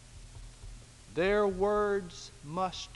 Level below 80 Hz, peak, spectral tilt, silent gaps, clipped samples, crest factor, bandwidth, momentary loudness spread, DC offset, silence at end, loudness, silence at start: -50 dBFS; -16 dBFS; -5 dB/octave; none; under 0.1%; 16 dB; 11.5 kHz; 23 LU; under 0.1%; 0 s; -31 LUFS; 0 s